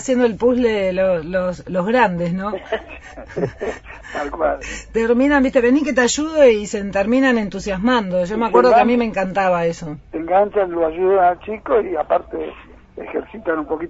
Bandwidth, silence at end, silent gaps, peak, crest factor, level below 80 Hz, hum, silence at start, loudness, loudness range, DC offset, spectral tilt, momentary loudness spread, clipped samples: 8 kHz; 0 s; none; 0 dBFS; 18 dB; -42 dBFS; none; 0 s; -18 LUFS; 6 LU; under 0.1%; -5 dB/octave; 14 LU; under 0.1%